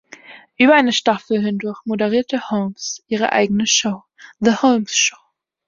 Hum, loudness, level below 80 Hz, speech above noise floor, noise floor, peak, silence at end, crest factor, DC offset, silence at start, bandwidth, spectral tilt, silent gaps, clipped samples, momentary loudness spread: none; -17 LUFS; -60 dBFS; 25 dB; -42 dBFS; -2 dBFS; 0.55 s; 18 dB; under 0.1%; 0.3 s; 7.6 kHz; -3 dB/octave; none; under 0.1%; 11 LU